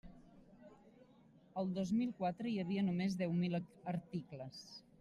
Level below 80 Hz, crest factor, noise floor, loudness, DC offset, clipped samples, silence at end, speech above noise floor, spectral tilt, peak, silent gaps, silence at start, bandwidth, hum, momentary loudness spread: -72 dBFS; 14 dB; -66 dBFS; -40 LUFS; under 0.1%; under 0.1%; 0.2 s; 26 dB; -7.5 dB/octave; -26 dBFS; none; 0.05 s; 11 kHz; none; 13 LU